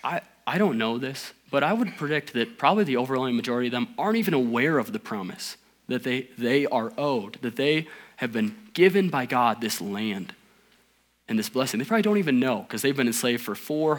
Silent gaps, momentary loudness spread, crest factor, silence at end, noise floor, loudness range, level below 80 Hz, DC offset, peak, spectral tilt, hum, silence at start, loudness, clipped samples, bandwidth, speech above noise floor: none; 10 LU; 20 dB; 0 s; -65 dBFS; 2 LU; -76 dBFS; under 0.1%; -6 dBFS; -5 dB/octave; none; 0.05 s; -25 LUFS; under 0.1%; 19.5 kHz; 40 dB